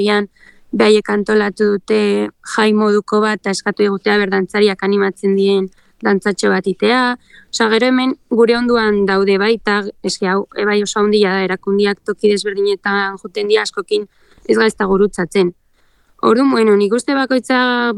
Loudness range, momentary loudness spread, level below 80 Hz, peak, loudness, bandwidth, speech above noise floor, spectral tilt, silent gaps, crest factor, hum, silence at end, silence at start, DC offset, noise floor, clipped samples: 2 LU; 7 LU; -50 dBFS; 0 dBFS; -15 LUFS; 11.5 kHz; 40 dB; -5 dB/octave; none; 14 dB; none; 0 s; 0 s; under 0.1%; -55 dBFS; under 0.1%